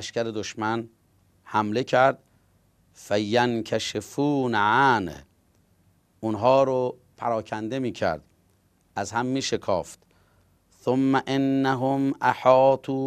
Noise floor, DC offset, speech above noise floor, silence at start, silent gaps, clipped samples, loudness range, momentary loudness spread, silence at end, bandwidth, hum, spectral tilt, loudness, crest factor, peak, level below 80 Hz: -64 dBFS; under 0.1%; 41 dB; 0 s; none; under 0.1%; 5 LU; 12 LU; 0 s; 14.5 kHz; none; -5.5 dB/octave; -24 LUFS; 20 dB; -4 dBFS; -62 dBFS